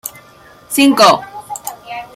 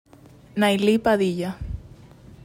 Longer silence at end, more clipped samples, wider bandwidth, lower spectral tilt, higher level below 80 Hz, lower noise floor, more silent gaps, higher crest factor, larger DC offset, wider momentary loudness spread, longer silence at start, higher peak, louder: second, 0.1 s vs 0.6 s; neither; about the same, 16 kHz vs 15.5 kHz; second, -3 dB/octave vs -6 dB/octave; second, -58 dBFS vs -42 dBFS; second, -43 dBFS vs -49 dBFS; neither; about the same, 16 dB vs 16 dB; neither; first, 20 LU vs 16 LU; second, 0.05 s vs 0.55 s; first, 0 dBFS vs -8 dBFS; first, -11 LUFS vs -22 LUFS